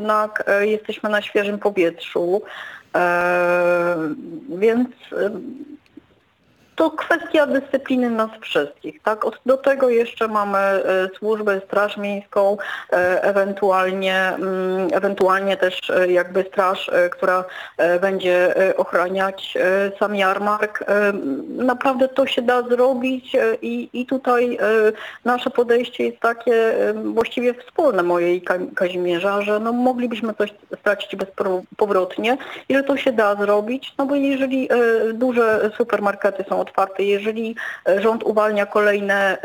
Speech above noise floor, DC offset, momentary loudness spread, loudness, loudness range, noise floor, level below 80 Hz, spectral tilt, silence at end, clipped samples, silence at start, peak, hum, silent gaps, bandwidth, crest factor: 39 dB; under 0.1%; 7 LU; -19 LUFS; 3 LU; -58 dBFS; -66 dBFS; -5.5 dB/octave; 0 s; under 0.1%; 0 s; -2 dBFS; none; none; 19 kHz; 18 dB